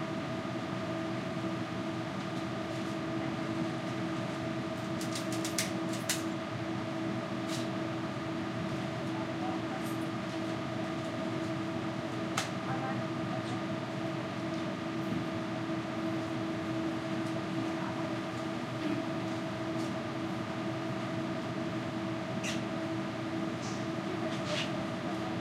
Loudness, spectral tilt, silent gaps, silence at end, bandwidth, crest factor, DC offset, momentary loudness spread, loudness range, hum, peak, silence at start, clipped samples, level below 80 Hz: -36 LUFS; -5 dB/octave; none; 0 s; 16 kHz; 22 dB; under 0.1%; 2 LU; 1 LU; none; -14 dBFS; 0 s; under 0.1%; -68 dBFS